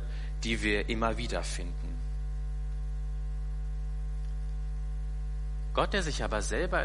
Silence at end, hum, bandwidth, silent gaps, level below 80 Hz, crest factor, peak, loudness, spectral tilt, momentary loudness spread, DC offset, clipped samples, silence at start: 0 s; 50 Hz at -35 dBFS; 11.5 kHz; none; -34 dBFS; 20 dB; -12 dBFS; -34 LUFS; -4.5 dB/octave; 9 LU; under 0.1%; under 0.1%; 0 s